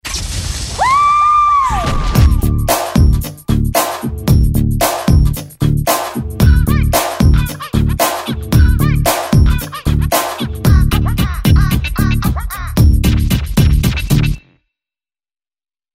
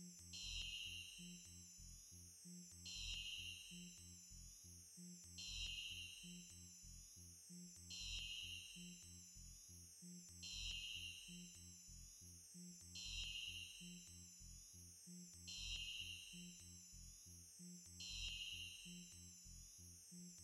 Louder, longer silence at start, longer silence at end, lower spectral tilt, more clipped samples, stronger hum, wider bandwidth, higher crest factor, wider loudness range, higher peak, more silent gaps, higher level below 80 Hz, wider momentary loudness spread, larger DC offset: first, -14 LUFS vs -53 LUFS; about the same, 0.05 s vs 0 s; first, 1.55 s vs 0 s; first, -5.5 dB/octave vs -1 dB/octave; neither; neither; about the same, 16.5 kHz vs 16 kHz; second, 12 dB vs 18 dB; about the same, 2 LU vs 2 LU; first, 0 dBFS vs -36 dBFS; neither; first, -16 dBFS vs -66 dBFS; second, 8 LU vs 11 LU; neither